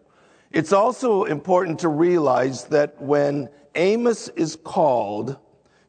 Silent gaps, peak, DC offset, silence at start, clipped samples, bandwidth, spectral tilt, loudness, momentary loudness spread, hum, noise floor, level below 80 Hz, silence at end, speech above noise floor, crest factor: none; -4 dBFS; under 0.1%; 0.55 s; under 0.1%; 9.4 kHz; -6 dB/octave; -21 LUFS; 9 LU; none; -56 dBFS; -70 dBFS; 0.55 s; 36 dB; 18 dB